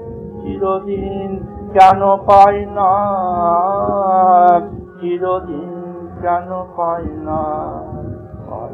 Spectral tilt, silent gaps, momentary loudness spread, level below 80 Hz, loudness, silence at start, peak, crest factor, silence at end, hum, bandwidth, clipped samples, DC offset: -7.5 dB/octave; none; 19 LU; -40 dBFS; -14 LUFS; 0 s; 0 dBFS; 16 dB; 0 s; none; 7.8 kHz; 0.3%; under 0.1%